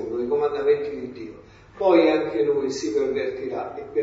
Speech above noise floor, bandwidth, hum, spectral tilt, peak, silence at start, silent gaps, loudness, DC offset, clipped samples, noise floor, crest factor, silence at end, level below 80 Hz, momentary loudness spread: 23 dB; 7.8 kHz; none; -5.5 dB/octave; -4 dBFS; 0 s; none; -23 LUFS; under 0.1%; under 0.1%; -45 dBFS; 18 dB; 0 s; -58 dBFS; 15 LU